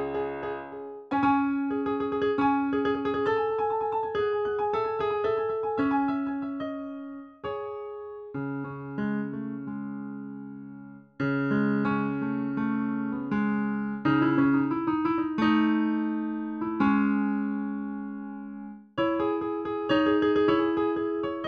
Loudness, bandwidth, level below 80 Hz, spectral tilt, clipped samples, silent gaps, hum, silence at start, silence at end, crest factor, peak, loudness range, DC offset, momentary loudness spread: -28 LUFS; 6.2 kHz; -60 dBFS; -8.5 dB/octave; under 0.1%; none; none; 0 s; 0 s; 16 dB; -12 dBFS; 9 LU; under 0.1%; 14 LU